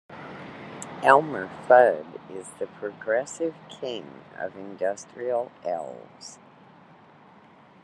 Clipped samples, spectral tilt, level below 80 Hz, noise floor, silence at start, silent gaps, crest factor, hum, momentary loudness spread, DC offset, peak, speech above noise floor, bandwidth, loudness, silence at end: under 0.1%; -4.5 dB/octave; -76 dBFS; -53 dBFS; 0.1 s; none; 26 dB; none; 21 LU; under 0.1%; -2 dBFS; 28 dB; 11.5 kHz; -25 LUFS; 1.5 s